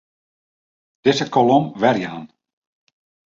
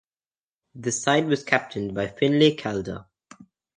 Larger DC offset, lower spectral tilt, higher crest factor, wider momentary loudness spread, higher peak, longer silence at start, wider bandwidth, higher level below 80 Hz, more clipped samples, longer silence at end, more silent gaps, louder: neither; about the same, -5.5 dB/octave vs -4.5 dB/octave; about the same, 20 dB vs 22 dB; about the same, 12 LU vs 13 LU; about the same, -2 dBFS vs -2 dBFS; first, 1.05 s vs 0.75 s; second, 7.6 kHz vs 10 kHz; about the same, -62 dBFS vs -58 dBFS; neither; first, 1 s vs 0.75 s; neither; first, -18 LUFS vs -23 LUFS